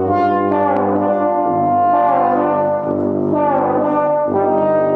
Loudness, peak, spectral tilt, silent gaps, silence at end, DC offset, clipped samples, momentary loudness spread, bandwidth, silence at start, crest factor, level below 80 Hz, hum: -15 LUFS; -4 dBFS; -10 dB/octave; none; 0 s; under 0.1%; under 0.1%; 3 LU; 4.9 kHz; 0 s; 12 dB; -62 dBFS; none